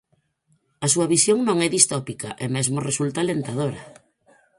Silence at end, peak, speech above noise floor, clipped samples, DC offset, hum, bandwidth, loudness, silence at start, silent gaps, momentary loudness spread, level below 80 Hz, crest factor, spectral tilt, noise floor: 0.65 s; 0 dBFS; 45 dB; under 0.1%; under 0.1%; none; 13.5 kHz; -21 LUFS; 0.8 s; none; 11 LU; -60 dBFS; 24 dB; -3.5 dB/octave; -67 dBFS